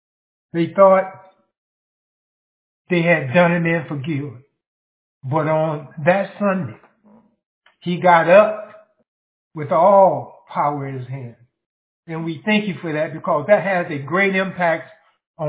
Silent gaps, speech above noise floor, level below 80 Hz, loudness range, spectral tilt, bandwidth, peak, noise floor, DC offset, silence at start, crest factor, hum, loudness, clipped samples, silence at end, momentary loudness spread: 1.58-2.85 s, 4.67-5.21 s, 7.46-7.61 s, 9.08-9.51 s, 11.66-12.03 s, 15.27-15.34 s; 36 dB; -68 dBFS; 6 LU; -10 dB/octave; 4 kHz; 0 dBFS; -53 dBFS; under 0.1%; 0.55 s; 20 dB; none; -18 LUFS; under 0.1%; 0 s; 19 LU